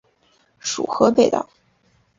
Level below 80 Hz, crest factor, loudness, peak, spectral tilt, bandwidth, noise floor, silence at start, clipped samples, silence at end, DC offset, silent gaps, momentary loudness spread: -60 dBFS; 22 dB; -19 LUFS; 0 dBFS; -4 dB/octave; 7.6 kHz; -61 dBFS; 0.65 s; under 0.1%; 0.75 s; under 0.1%; none; 14 LU